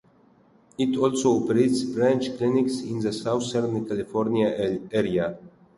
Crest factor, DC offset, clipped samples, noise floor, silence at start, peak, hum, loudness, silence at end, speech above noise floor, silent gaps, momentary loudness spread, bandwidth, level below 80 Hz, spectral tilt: 16 dB; under 0.1%; under 0.1%; -58 dBFS; 0.8 s; -8 dBFS; none; -24 LUFS; 0.3 s; 34 dB; none; 7 LU; 11.5 kHz; -60 dBFS; -6 dB/octave